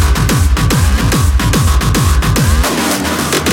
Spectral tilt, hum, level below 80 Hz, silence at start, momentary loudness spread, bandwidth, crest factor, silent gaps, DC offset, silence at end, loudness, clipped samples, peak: -4.5 dB/octave; none; -14 dBFS; 0 s; 2 LU; 17.5 kHz; 10 dB; none; under 0.1%; 0 s; -12 LUFS; under 0.1%; 0 dBFS